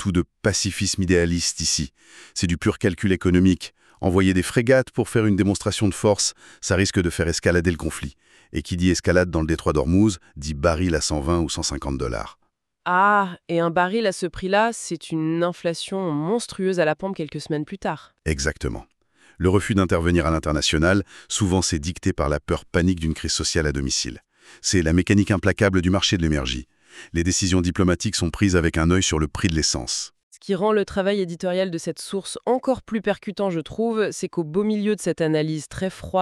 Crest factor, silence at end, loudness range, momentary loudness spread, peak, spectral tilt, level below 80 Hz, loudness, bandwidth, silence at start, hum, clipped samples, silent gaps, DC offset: 18 dB; 0 s; 4 LU; 9 LU; -4 dBFS; -4.5 dB/octave; -38 dBFS; -22 LUFS; 13 kHz; 0 s; none; under 0.1%; 30.23-30.31 s; under 0.1%